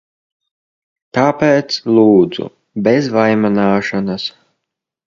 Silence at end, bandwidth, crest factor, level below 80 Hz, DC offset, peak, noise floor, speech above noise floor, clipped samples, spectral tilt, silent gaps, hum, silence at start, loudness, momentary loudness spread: 0.75 s; 7.4 kHz; 16 dB; -54 dBFS; under 0.1%; 0 dBFS; -78 dBFS; 65 dB; under 0.1%; -6.5 dB/octave; none; none; 1.15 s; -14 LUFS; 12 LU